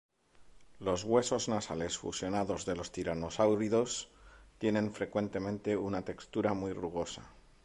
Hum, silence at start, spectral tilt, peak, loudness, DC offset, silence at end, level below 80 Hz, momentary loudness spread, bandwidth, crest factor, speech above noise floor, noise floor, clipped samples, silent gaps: none; 0.4 s; -5 dB/octave; -16 dBFS; -34 LUFS; under 0.1%; 0.25 s; -58 dBFS; 9 LU; 11.5 kHz; 20 dB; 27 dB; -60 dBFS; under 0.1%; none